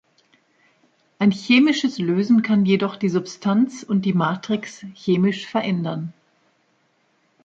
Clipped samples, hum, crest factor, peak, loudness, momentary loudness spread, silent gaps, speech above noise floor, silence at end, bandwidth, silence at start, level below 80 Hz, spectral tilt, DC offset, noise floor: under 0.1%; none; 16 dB; -4 dBFS; -20 LUFS; 10 LU; none; 45 dB; 1.35 s; 7.8 kHz; 1.2 s; -66 dBFS; -6.5 dB/octave; under 0.1%; -64 dBFS